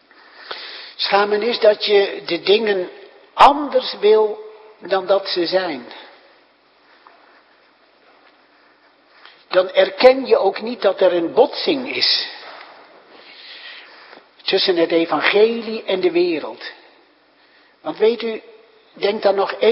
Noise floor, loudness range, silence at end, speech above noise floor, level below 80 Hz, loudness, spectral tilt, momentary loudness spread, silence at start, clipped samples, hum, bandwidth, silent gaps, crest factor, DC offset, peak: -55 dBFS; 8 LU; 0 s; 38 dB; -60 dBFS; -17 LUFS; -5 dB/octave; 21 LU; 0.4 s; under 0.1%; none; 8.2 kHz; none; 20 dB; under 0.1%; 0 dBFS